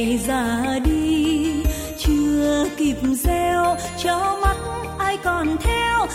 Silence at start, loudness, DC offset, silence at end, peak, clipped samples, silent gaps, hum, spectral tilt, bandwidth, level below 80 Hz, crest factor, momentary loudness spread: 0 s; -21 LUFS; under 0.1%; 0 s; -6 dBFS; under 0.1%; none; none; -5 dB/octave; 16.5 kHz; -28 dBFS; 14 dB; 5 LU